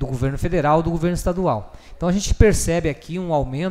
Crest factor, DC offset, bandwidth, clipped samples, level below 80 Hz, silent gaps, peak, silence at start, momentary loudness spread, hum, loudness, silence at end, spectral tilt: 18 dB; under 0.1%; 15.5 kHz; under 0.1%; -28 dBFS; none; 0 dBFS; 0 s; 8 LU; none; -21 LUFS; 0 s; -6 dB/octave